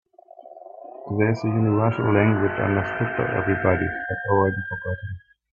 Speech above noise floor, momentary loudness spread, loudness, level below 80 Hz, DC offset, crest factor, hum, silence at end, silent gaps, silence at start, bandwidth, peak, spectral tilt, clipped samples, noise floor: 25 dB; 18 LU; -23 LUFS; -52 dBFS; under 0.1%; 20 dB; none; 0.35 s; none; 0.4 s; 7 kHz; -4 dBFS; -9.5 dB/octave; under 0.1%; -47 dBFS